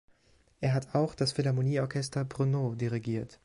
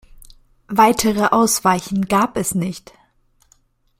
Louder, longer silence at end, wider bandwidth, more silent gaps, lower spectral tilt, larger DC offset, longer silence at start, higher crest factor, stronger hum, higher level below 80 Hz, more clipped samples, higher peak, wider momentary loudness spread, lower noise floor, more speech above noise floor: second, -31 LUFS vs -17 LUFS; second, 0.1 s vs 1.2 s; second, 11.5 kHz vs 16.5 kHz; neither; first, -6.5 dB/octave vs -4 dB/octave; neither; first, 0.6 s vs 0.2 s; about the same, 16 dB vs 18 dB; neither; second, -62 dBFS vs -48 dBFS; neither; second, -16 dBFS vs -2 dBFS; second, 5 LU vs 9 LU; first, -65 dBFS vs -59 dBFS; second, 35 dB vs 42 dB